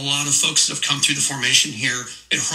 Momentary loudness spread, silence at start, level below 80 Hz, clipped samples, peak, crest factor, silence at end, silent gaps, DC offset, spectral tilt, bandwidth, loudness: 7 LU; 0 s; -60 dBFS; under 0.1%; -2 dBFS; 18 dB; 0 s; none; under 0.1%; -0.5 dB/octave; 16 kHz; -17 LUFS